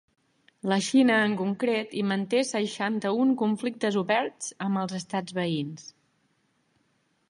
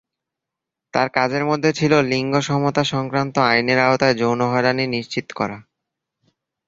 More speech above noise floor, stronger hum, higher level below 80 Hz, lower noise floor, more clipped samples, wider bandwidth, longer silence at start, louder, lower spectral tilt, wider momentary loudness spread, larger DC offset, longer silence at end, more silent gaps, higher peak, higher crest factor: second, 44 dB vs 66 dB; neither; second, -76 dBFS vs -56 dBFS; second, -71 dBFS vs -84 dBFS; neither; first, 11 kHz vs 7.8 kHz; second, 0.65 s vs 0.95 s; second, -27 LUFS vs -19 LUFS; about the same, -5 dB/octave vs -5.5 dB/octave; about the same, 10 LU vs 9 LU; neither; first, 1.4 s vs 1.05 s; neither; second, -10 dBFS vs -2 dBFS; about the same, 18 dB vs 18 dB